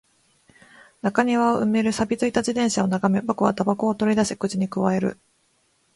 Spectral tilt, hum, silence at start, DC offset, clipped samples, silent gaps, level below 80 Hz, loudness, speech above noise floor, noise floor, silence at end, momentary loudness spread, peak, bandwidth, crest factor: -5.5 dB/octave; none; 1.05 s; under 0.1%; under 0.1%; none; -58 dBFS; -22 LUFS; 44 dB; -65 dBFS; 0.85 s; 5 LU; -4 dBFS; 11.5 kHz; 20 dB